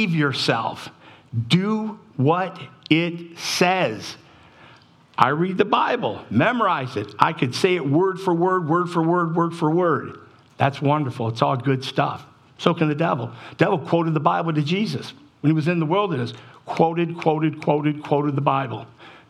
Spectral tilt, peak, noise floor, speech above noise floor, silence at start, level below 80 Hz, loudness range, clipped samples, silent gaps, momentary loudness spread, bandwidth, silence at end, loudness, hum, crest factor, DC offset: -6 dB/octave; 0 dBFS; -51 dBFS; 30 dB; 0 s; -68 dBFS; 3 LU; under 0.1%; none; 12 LU; 13 kHz; 0.1 s; -21 LUFS; none; 22 dB; under 0.1%